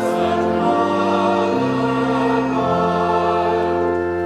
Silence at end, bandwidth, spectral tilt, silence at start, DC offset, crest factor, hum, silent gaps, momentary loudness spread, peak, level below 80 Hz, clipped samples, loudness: 0 s; 12.5 kHz; -7 dB/octave; 0 s; under 0.1%; 12 dB; none; none; 1 LU; -4 dBFS; -48 dBFS; under 0.1%; -18 LUFS